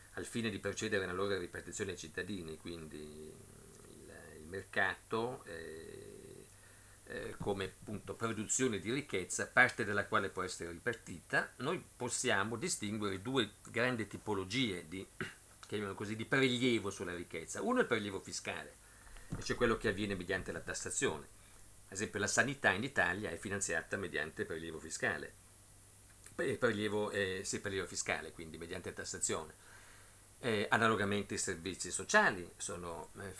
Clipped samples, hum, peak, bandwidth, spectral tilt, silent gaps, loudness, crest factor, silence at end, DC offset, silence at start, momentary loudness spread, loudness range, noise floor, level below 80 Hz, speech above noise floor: under 0.1%; none; -12 dBFS; 11 kHz; -3.5 dB/octave; none; -37 LUFS; 26 dB; 0 s; under 0.1%; 0 s; 20 LU; 7 LU; -60 dBFS; -62 dBFS; 22 dB